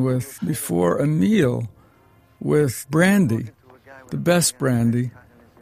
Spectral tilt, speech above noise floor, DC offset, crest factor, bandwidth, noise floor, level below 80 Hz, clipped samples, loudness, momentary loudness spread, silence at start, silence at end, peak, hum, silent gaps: -5.5 dB/octave; 35 dB; under 0.1%; 16 dB; 15.5 kHz; -55 dBFS; -54 dBFS; under 0.1%; -20 LUFS; 13 LU; 0 s; 0.5 s; -4 dBFS; none; none